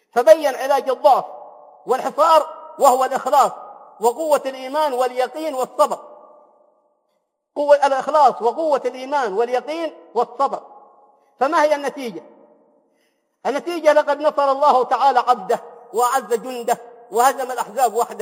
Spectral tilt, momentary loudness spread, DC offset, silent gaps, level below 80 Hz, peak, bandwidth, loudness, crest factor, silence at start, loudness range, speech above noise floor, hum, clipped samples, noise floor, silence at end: -2.5 dB/octave; 12 LU; under 0.1%; none; -82 dBFS; 0 dBFS; 16.5 kHz; -18 LUFS; 20 dB; 0.15 s; 5 LU; 53 dB; none; under 0.1%; -71 dBFS; 0 s